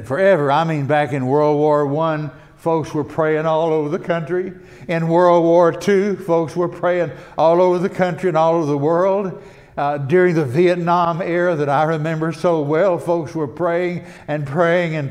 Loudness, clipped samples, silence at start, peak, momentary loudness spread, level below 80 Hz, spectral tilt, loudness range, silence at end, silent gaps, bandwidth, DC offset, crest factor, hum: -17 LUFS; under 0.1%; 0 s; -2 dBFS; 10 LU; -56 dBFS; -7.5 dB/octave; 3 LU; 0 s; none; 11.5 kHz; under 0.1%; 16 dB; none